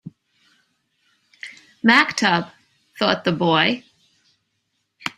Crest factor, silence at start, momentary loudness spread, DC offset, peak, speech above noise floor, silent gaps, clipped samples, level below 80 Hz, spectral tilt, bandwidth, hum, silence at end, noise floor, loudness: 24 dB; 0.05 s; 23 LU; under 0.1%; 0 dBFS; 55 dB; none; under 0.1%; -64 dBFS; -4.5 dB/octave; 13.5 kHz; none; 0.1 s; -73 dBFS; -18 LUFS